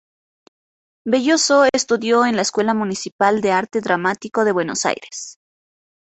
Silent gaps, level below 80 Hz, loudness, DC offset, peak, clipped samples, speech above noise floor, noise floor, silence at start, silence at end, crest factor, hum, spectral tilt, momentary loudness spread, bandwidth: 3.12-3.19 s; -62 dBFS; -18 LUFS; under 0.1%; -2 dBFS; under 0.1%; over 72 dB; under -90 dBFS; 1.05 s; 0.7 s; 18 dB; none; -3 dB/octave; 11 LU; 8.4 kHz